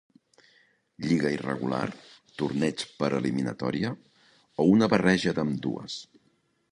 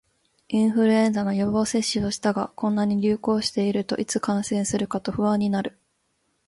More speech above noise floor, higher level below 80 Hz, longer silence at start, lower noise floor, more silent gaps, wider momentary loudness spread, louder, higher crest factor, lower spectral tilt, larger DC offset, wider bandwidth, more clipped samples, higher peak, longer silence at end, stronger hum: second, 43 dB vs 48 dB; about the same, -60 dBFS vs -56 dBFS; first, 1 s vs 0.5 s; about the same, -69 dBFS vs -71 dBFS; neither; first, 16 LU vs 6 LU; second, -27 LUFS vs -23 LUFS; first, 22 dB vs 14 dB; about the same, -6 dB/octave vs -5 dB/octave; neither; about the same, 11 kHz vs 11.5 kHz; neither; first, -6 dBFS vs -10 dBFS; about the same, 0.7 s vs 0.8 s; neither